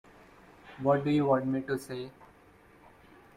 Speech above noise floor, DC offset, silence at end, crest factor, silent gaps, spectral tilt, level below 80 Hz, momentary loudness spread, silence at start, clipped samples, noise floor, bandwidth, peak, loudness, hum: 30 dB; under 0.1%; 1.25 s; 20 dB; none; -7.5 dB/octave; -66 dBFS; 17 LU; 0.65 s; under 0.1%; -58 dBFS; 15.5 kHz; -14 dBFS; -30 LUFS; none